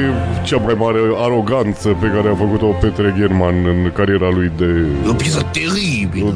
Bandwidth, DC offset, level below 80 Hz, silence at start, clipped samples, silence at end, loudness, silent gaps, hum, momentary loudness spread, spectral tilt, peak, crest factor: 11 kHz; under 0.1%; -30 dBFS; 0 s; under 0.1%; 0 s; -15 LUFS; none; none; 2 LU; -6.5 dB/octave; 0 dBFS; 14 dB